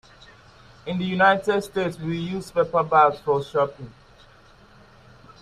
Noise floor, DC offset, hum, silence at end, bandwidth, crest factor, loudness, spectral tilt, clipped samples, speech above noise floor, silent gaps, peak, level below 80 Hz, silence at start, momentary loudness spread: -52 dBFS; under 0.1%; none; 1.5 s; 14 kHz; 22 dB; -22 LUFS; -6 dB/octave; under 0.1%; 30 dB; none; -4 dBFS; -56 dBFS; 0.85 s; 13 LU